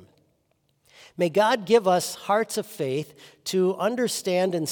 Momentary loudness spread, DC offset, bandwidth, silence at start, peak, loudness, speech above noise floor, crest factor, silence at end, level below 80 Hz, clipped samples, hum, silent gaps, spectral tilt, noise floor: 10 LU; under 0.1%; 18 kHz; 1.2 s; -6 dBFS; -24 LUFS; 46 dB; 18 dB; 0 s; -76 dBFS; under 0.1%; none; none; -4.5 dB/octave; -70 dBFS